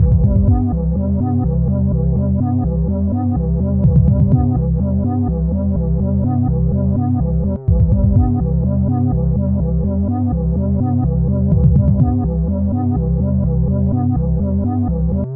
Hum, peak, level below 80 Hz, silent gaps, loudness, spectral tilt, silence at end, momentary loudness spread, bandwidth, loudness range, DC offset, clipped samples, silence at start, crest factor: none; -2 dBFS; -22 dBFS; none; -16 LUFS; -15.5 dB/octave; 0 s; 4 LU; 1.9 kHz; 1 LU; 0.2%; under 0.1%; 0 s; 14 dB